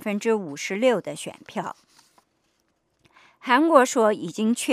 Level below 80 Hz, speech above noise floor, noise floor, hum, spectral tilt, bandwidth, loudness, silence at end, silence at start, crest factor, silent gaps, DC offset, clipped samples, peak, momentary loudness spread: -78 dBFS; 48 dB; -70 dBFS; none; -4 dB/octave; 15.5 kHz; -22 LUFS; 0 s; 0 s; 22 dB; none; under 0.1%; under 0.1%; -2 dBFS; 17 LU